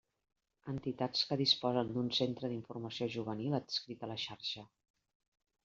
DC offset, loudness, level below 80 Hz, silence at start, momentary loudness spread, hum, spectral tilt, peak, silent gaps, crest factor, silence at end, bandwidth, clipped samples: under 0.1%; -36 LUFS; -74 dBFS; 0.65 s; 13 LU; none; -4 dB/octave; -16 dBFS; none; 22 dB; 1 s; 7.6 kHz; under 0.1%